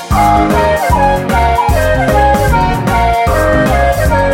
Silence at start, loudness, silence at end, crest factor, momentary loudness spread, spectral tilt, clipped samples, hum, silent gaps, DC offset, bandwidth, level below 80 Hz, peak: 0 s; -11 LUFS; 0 s; 10 dB; 2 LU; -6 dB/octave; under 0.1%; none; none; under 0.1%; 17 kHz; -18 dBFS; 0 dBFS